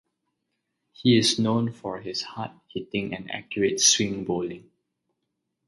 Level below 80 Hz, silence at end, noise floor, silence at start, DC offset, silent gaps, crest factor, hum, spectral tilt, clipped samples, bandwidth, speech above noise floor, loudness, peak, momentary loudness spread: -62 dBFS; 1.05 s; -80 dBFS; 1 s; under 0.1%; none; 22 dB; none; -3.5 dB/octave; under 0.1%; 11.5 kHz; 55 dB; -24 LUFS; -6 dBFS; 16 LU